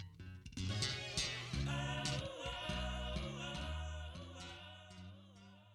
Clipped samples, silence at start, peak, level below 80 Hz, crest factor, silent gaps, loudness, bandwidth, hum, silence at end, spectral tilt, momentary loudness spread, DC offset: under 0.1%; 0 s; -26 dBFS; -50 dBFS; 18 dB; none; -42 LUFS; 13.5 kHz; none; 0 s; -4 dB/octave; 16 LU; under 0.1%